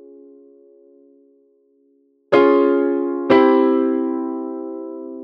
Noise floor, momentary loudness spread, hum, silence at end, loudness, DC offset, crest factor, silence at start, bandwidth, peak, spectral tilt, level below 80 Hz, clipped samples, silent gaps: -59 dBFS; 16 LU; none; 0 s; -17 LUFS; under 0.1%; 16 dB; 2.3 s; 5.8 kHz; -2 dBFS; -7.5 dB/octave; -66 dBFS; under 0.1%; none